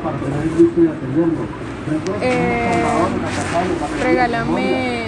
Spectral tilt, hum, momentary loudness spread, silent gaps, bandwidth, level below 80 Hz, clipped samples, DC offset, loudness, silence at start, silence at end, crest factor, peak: -6.5 dB/octave; none; 7 LU; none; 11.5 kHz; -40 dBFS; under 0.1%; under 0.1%; -18 LUFS; 0 s; 0 s; 16 dB; -2 dBFS